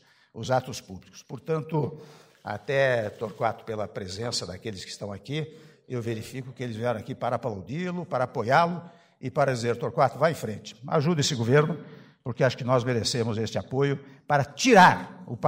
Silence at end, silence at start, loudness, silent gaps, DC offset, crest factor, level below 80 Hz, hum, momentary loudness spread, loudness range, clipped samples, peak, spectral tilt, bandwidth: 0 s; 0.35 s; -26 LUFS; none; under 0.1%; 22 dB; -64 dBFS; none; 15 LU; 8 LU; under 0.1%; -6 dBFS; -5 dB/octave; 16 kHz